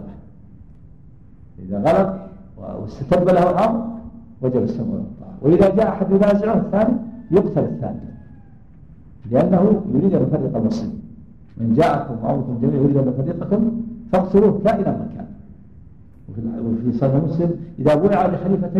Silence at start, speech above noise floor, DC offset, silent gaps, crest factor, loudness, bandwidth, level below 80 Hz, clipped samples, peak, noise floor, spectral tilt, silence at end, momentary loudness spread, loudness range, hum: 0 s; 28 dB; 0.5%; none; 18 dB; -19 LUFS; 8 kHz; -44 dBFS; under 0.1%; -2 dBFS; -45 dBFS; -9.5 dB/octave; 0 s; 17 LU; 3 LU; none